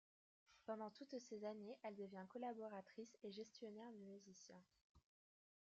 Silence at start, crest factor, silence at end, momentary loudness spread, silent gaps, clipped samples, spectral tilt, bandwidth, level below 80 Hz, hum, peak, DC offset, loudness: 0.5 s; 18 dB; 0.7 s; 10 LU; 4.82-4.95 s; under 0.1%; -4.5 dB/octave; 8 kHz; under -90 dBFS; none; -38 dBFS; under 0.1%; -56 LUFS